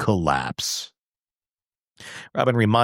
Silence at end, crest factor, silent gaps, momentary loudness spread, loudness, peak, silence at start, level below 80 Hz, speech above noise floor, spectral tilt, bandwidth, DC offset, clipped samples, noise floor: 0 s; 20 dB; 1.06-1.13 s, 1.19-1.23 s, 1.67-1.71 s, 1.91-1.95 s; 19 LU; -23 LUFS; -4 dBFS; 0 s; -50 dBFS; over 68 dB; -5 dB/octave; 16.5 kHz; under 0.1%; under 0.1%; under -90 dBFS